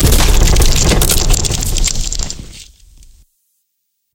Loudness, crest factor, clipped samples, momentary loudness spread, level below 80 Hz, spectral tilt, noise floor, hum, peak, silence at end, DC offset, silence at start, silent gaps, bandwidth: -13 LUFS; 12 dB; under 0.1%; 15 LU; -14 dBFS; -3 dB/octave; -69 dBFS; none; 0 dBFS; 1.5 s; under 0.1%; 0 s; none; 17.5 kHz